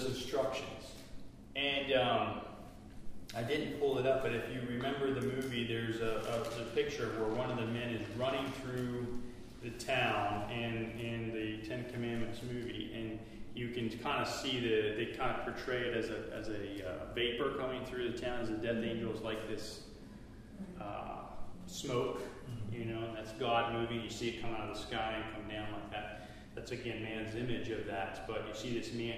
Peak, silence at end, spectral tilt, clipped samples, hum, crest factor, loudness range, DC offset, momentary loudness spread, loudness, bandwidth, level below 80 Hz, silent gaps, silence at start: -18 dBFS; 0 s; -5 dB/octave; under 0.1%; none; 20 dB; 5 LU; under 0.1%; 14 LU; -38 LUFS; 15.5 kHz; -56 dBFS; none; 0 s